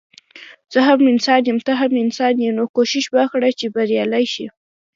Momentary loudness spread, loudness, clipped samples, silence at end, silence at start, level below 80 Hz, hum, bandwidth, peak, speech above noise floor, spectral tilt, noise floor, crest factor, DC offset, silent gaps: 8 LU; -17 LUFS; under 0.1%; 0.45 s; 0.35 s; -70 dBFS; none; 7.6 kHz; 0 dBFS; 26 dB; -4 dB/octave; -42 dBFS; 16 dB; under 0.1%; 2.69-2.74 s